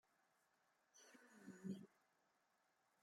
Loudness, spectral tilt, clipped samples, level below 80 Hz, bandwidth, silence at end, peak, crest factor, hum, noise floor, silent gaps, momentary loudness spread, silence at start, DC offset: -58 LUFS; -6 dB/octave; under 0.1%; under -90 dBFS; 16 kHz; 1.05 s; -40 dBFS; 22 dB; none; -84 dBFS; none; 14 LU; 0.95 s; under 0.1%